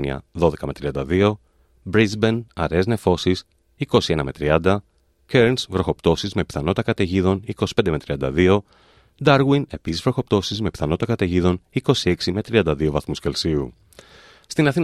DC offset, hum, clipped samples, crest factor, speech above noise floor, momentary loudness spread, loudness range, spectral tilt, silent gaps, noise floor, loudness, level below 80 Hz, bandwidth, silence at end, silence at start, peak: under 0.1%; none; under 0.1%; 20 dB; 28 dB; 7 LU; 1 LU; -6 dB/octave; none; -48 dBFS; -21 LUFS; -42 dBFS; 13 kHz; 0 s; 0 s; -2 dBFS